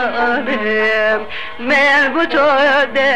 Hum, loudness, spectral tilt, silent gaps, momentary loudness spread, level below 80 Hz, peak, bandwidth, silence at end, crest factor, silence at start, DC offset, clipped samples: none; -13 LUFS; -4 dB/octave; none; 7 LU; -50 dBFS; -6 dBFS; 10.5 kHz; 0 s; 10 dB; 0 s; 3%; under 0.1%